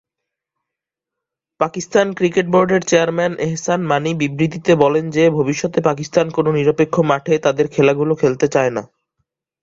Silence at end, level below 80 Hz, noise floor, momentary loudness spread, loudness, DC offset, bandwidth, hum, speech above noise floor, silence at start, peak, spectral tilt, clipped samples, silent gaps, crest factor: 0.75 s; -56 dBFS; -84 dBFS; 5 LU; -16 LUFS; under 0.1%; 7.8 kHz; none; 68 dB; 1.6 s; 0 dBFS; -5.5 dB/octave; under 0.1%; none; 16 dB